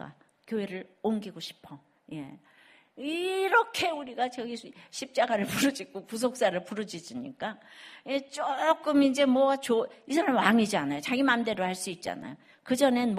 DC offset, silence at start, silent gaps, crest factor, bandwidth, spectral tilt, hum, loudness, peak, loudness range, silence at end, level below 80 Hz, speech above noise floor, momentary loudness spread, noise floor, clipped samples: under 0.1%; 0 s; none; 22 dB; 15 kHz; -4 dB/octave; none; -28 LUFS; -6 dBFS; 6 LU; 0 s; -72 dBFS; 20 dB; 18 LU; -48 dBFS; under 0.1%